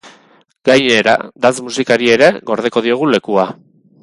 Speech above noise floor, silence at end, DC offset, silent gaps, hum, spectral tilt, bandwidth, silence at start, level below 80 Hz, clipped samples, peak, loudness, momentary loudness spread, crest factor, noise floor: 38 dB; 0.5 s; under 0.1%; none; none; -4 dB/octave; 11.5 kHz; 0.05 s; -56 dBFS; under 0.1%; 0 dBFS; -13 LUFS; 8 LU; 14 dB; -50 dBFS